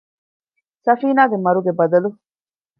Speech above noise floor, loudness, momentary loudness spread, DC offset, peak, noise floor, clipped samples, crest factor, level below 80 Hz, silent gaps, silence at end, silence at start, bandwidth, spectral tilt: over 74 dB; -17 LUFS; 7 LU; under 0.1%; -2 dBFS; under -90 dBFS; under 0.1%; 18 dB; -74 dBFS; none; 0.65 s; 0.85 s; 5.4 kHz; -10 dB/octave